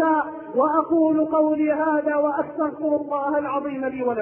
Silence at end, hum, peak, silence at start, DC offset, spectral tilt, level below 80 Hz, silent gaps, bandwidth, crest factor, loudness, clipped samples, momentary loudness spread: 0 s; none; -6 dBFS; 0 s; under 0.1%; -11 dB/octave; -62 dBFS; none; 3.2 kHz; 14 dB; -22 LUFS; under 0.1%; 6 LU